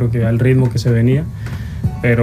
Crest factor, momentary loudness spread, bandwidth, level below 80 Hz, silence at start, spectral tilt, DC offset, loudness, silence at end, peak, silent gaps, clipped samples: 12 dB; 12 LU; 11 kHz; -34 dBFS; 0 s; -8 dB/octave; under 0.1%; -16 LUFS; 0 s; -2 dBFS; none; under 0.1%